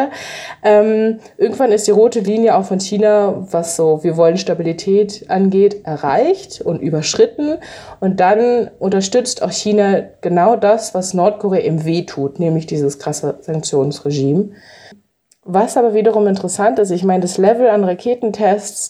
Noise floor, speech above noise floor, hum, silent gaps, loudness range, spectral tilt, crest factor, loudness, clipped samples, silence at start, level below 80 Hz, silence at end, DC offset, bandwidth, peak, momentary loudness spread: -55 dBFS; 41 dB; none; none; 4 LU; -5.5 dB/octave; 14 dB; -15 LUFS; under 0.1%; 0 s; -58 dBFS; 0 s; under 0.1%; 13.5 kHz; -2 dBFS; 8 LU